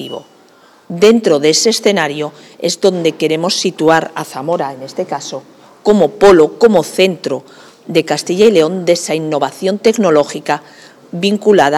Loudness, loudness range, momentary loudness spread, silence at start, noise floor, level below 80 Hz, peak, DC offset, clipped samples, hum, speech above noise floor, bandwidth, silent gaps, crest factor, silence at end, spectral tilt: -13 LUFS; 4 LU; 14 LU; 0 s; -45 dBFS; -52 dBFS; 0 dBFS; under 0.1%; under 0.1%; none; 33 dB; 15 kHz; none; 12 dB; 0 s; -4 dB/octave